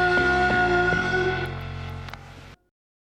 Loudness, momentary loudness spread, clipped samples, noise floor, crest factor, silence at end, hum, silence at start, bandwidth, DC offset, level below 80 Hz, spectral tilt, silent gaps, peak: -22 LUFS; 17 LU; under 0.1%; -45 dBFS; 14 dB; 0.65 s; none; 0 s; 11 kHz; under 0.1%; -42 dBFS; -5.5 dB/octave; none; -10 dBFS